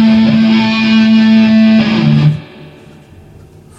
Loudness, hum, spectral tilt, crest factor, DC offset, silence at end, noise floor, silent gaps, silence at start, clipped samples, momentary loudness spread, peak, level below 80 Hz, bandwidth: -9 LUFS; none; -7.5 dB/octave; 10 dB; under 0.1%; 1.15 s; -37 dBFS; none; 0 s; under 0.1%; 4 LU; 0 dBFS; -44 dBFS; 7 kHz